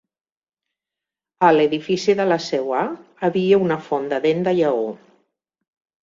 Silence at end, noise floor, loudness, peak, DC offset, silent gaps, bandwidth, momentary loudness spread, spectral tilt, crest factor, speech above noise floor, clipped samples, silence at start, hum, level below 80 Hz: 1.05 s; -87 dBFS; -19 LUFS; -2 dBFS; under 0.1%; none; 7.6 kHz; 8 LU; -6 dB/octave; 18 dB; 69 dB; under 0.1%; 1.4 s; none; -64 dBFS